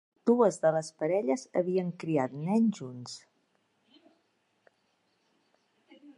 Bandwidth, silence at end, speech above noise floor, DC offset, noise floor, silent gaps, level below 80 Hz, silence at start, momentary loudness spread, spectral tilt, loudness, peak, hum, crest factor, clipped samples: 11 kHz; 0.05 s; 45 dB; under 0.1%; -74 dBFS; none; -82 dBFS; 0.25 s; 16 LU; -6.5 dB/octave; -29 LUFS; -12 dBFS; none; 20 dB; under 0.1%